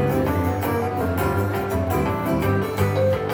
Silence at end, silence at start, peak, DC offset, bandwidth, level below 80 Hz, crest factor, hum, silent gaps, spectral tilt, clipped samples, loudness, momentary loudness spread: 0 s; 0 s; -8 dBFS; under 0.1%; 18.5 kHz; -38 dBFS; 12 dB; none; none; -7 dB/octave; under 0.1%; -22 LUFS; 2 LU